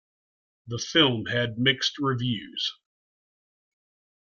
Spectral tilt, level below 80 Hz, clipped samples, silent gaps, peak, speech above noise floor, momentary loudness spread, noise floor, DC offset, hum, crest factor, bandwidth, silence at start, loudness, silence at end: -4.5 dB/octave; -64 dBFS; under 0.1%; none; -6 dBFS; over 64 dB; 10 LU; under -90 dBFS; under 0.1%; none; 22 dB; 7.4 kHz; 0.65 s; -25 LUFS; 1.55 s